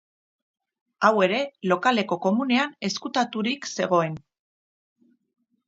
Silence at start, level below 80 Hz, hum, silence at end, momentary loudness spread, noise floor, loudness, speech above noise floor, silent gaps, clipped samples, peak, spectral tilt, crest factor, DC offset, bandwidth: 1 s; -74 dBFS; none; 1.5 s; 6 LU; under -90 dBFS; -24 LUFS; over 67 dB; none; under 0.1%; -4 dBFS; -4.5 dB/octave; 22 dB; under 0.1%; 7.8 kHz